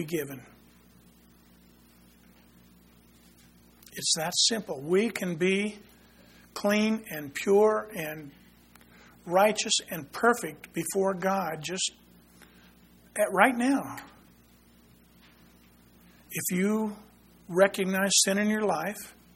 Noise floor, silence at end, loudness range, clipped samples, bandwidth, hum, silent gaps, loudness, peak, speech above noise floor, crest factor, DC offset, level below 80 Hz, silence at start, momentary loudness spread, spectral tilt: -58 dBFS; 0.25 s; 7 LU; under 0.1%; 16.5 kHz; none; none; -27 LUFS; -4 dBFS; 31 dB; 26 dB; under 0.1%; -66 dBFS; 0 s; 15 LU; -3 dB/octave